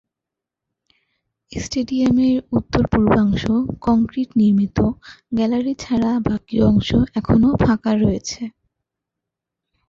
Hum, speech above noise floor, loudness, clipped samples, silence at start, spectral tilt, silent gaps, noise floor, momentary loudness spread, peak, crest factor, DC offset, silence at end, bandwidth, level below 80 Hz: none; 68 dB; -18 LUFS; under 0.1%; 1.5 s; -7 dB/octave; none; -85 dBFS; 9 LU; -2 dBFS; 18 dB; under 0.1%; 1.4 s; 7.6 kHz; -36 dBFS